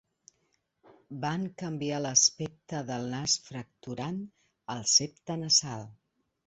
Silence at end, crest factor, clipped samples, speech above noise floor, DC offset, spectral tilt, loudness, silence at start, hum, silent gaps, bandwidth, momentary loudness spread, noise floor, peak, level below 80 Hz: 0.55 s; 24 dB; under 0.1%; 45 dB; under 0.1%; -2.5 dB/octave; -28 LUFS; 1.1 s; none; none; 8.4 kHz; 19 LU; -76 dBFS; -10 dBFS; -68 dBFS